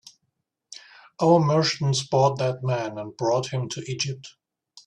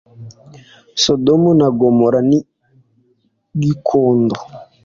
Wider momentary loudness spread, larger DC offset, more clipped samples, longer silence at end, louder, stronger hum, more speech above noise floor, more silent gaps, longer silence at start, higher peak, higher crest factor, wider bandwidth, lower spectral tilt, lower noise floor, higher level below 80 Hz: first, 21 LU vs 14 LU; neither; neither; first, 0.55 s vs 0.2 s; second, -24 LUFS vs -14 LUFS; neither; first, 54 dB vs 47 dB; neither; first, 0.7 s vs 0.2 s; second, -6 dBFS vs -2 dBFS; about the same, 18 dB vs 14 dB; first, 10.5 kHz vs 7.6 kHz; about the same, -5.5 dB/octave vs -6 dB/octave; first, -77 dBFS vs -61 dBFS; second, -64 dBFS vs -52 dBFS